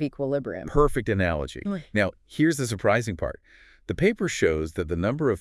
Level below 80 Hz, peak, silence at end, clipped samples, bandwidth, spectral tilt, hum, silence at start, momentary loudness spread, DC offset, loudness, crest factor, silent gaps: -40 dBFS; -8 dBFS; 0 s; under 0.1%; 12 kHz; -6 dB/octave; none; 0 s; 9 LU; under 0.1%; -26 LUFS; 18 dB; none